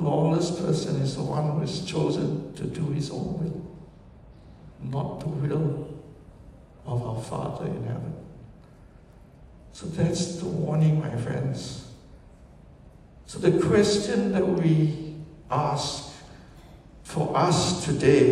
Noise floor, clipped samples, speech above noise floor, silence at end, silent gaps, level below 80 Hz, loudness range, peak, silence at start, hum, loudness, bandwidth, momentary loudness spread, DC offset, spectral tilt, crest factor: -50 dBFS; under 0.1%; 26 dB; 0 s; none; -52 dBFS; 9 LU; -6 dBFS; 0 s; none; -26 LUFS; 11.5 kHz; 19 LU; under 0.1%; -6 dB/octave; 22 dB